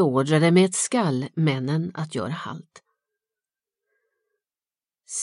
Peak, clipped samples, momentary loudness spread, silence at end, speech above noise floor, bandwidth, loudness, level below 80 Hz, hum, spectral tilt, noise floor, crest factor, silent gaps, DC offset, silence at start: -6 dBFS; under 0.1%; 15 LU; 0 s; over 68 dB; 11.5 kHz; -23 LUFS; -72 dBFS; none; -5.5 dB/octave; under -90 dBFS; 20 dB; none; under 0.1%; 0 s